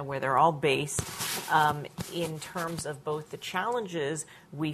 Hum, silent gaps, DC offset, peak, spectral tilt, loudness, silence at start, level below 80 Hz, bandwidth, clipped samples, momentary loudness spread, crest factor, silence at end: none; none; under 0.1%; -8 dBFS; -4 dB/octave; -30 LUFS; 0 s; -58 dBFS; 14.5 kHz; under 0.1%; 11 LU; 22 dB; 0 s